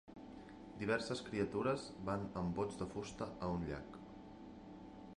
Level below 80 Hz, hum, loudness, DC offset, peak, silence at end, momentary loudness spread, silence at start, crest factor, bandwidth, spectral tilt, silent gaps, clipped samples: -62 dBFS; 50 Hz at -60 dBFS; -42 LUFS; under 0.1%; -24 dBFS; 0.05 s; 16 LU; 0.05 s; 20 dB; 11 kHz; -6 dB/octave; none; under 0.1%